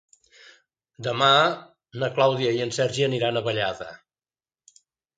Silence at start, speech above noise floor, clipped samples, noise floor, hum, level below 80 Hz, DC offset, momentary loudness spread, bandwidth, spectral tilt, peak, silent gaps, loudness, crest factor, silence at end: 1 s; over 67 dB; under 0.1%; under -90 dBFS; none; -66 dBFS; under 0.1%; 18 LU; 9.4 kHz; -4.5 dB/octave; -4 dBFS; none; -23 LUFS; 20 dB; 1.2 s